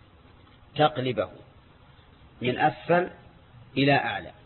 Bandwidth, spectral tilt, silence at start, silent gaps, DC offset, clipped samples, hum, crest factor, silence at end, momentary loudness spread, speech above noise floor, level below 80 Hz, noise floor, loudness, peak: 4.3 kHz; -10 dB/octave; 0.75 s; none; under 0.1%; under 0.1%; none; 18 dB; 0.15 s; 12 LU; 29 dB; -58 dBFS; -54 dBFS; -26 LUFS; -10 dBFS